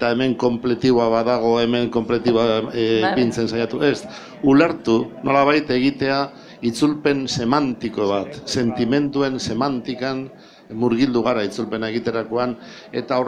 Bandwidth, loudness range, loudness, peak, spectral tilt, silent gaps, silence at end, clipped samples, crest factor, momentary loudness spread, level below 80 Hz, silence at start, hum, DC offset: 11 kHz; 4 LU; -20 LUFS; -2 dBFS; -5.5 dB/octave; none; 0 s; under 0.1%; 18 dB; 8 LU; -52 dBFS; 0 s; none; under 0.1%